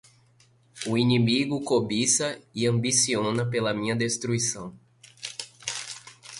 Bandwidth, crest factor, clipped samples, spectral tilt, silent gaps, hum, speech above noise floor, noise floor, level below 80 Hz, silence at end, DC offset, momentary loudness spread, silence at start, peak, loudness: 11.5 kHz; 18 dB; under 0.1%; -4 dB/octave; none; none; 36 dB; -60 dBFS; -62 dBFS; 0 s; under 0.1%; 15 LU; 0.75 s; -8 dBFS; -25 LUFS